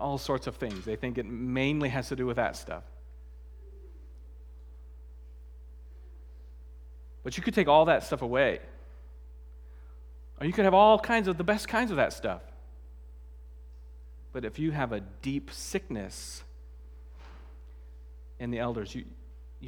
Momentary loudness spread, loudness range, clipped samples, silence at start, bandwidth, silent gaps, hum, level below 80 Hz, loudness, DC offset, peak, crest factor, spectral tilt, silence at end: 26 LU; 21 LU; under 0.1%; 0 s; 18.5 kHz; none; none; -48 dBFS; -29 LUFS; under 0.1%; -8 dBFS; 24 dB; -5.5 dB/octave; 0 s